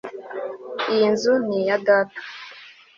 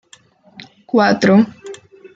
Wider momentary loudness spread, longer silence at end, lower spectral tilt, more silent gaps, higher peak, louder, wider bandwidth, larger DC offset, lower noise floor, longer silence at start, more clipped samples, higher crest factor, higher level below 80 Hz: second, 18 LU vs 23 LU; second, 0.25 s vs 0.4 s; second, -4.5 dB/octave vs -6.5 dB/octave; neither; about the same, -4 dBFS vs -2 dBFS; second, -21 LUFS vs -14 LUFS; about the same, 7.6 kHz vs 7.8 kHz; neither; second, -45 dBFS vs -49 dBFS; second, 0.05 s vs 0.95 s; neither; about the same, 18 dB vs 16 dB; second, -70 dBFS vs -60 dBFS